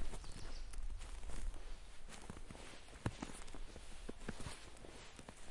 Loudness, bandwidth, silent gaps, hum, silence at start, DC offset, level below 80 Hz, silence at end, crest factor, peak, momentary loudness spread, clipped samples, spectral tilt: -53 LUFS; 11.5 kHz; none; none; 0 s; under 0.1%; -50 dBFS; 0 s; 20 dB; -24 dBFS; 9 LU; under 0.1%; -4.5 dB/octave